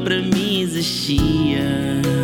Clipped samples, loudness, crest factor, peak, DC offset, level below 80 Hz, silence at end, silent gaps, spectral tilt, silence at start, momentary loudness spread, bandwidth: under 0.1%; -19 LUFS; 14 dB; -4 dBFS; under 0.1%; -34 dBFS; 0 s; none; -5 dB/octave; 0 s; 3 LU; 18.5 kHz